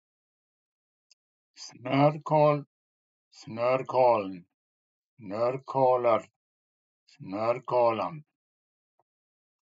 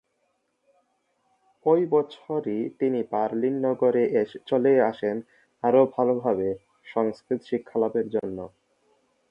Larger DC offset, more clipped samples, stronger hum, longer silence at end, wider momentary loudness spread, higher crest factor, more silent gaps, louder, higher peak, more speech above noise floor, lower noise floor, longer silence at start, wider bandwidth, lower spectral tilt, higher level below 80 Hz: neither; neither; neither; first, 1.45 s vs 0.85 s; first, 19 LU vs 10 LU; about the same, 20 dB vs 18 dB; first, 2.67-3.31 s, 4.54-5.17 s, 6.36-7.06 s vs none; about the same, -26 LUFS vs -25 LUFS; about the same, -10 dBFS vs -8 dBFS; first, over 64 dB vs 49 dB; first, under -90 dBFS vs -73 dBFS; about the same, 1.6 s vs 1.65 s; first, 7.8 kHz vs 5.6 kHz; second, -7.5 dB/octave vs -9 dB/octave; second, -86 dBFS vs -68 dBFS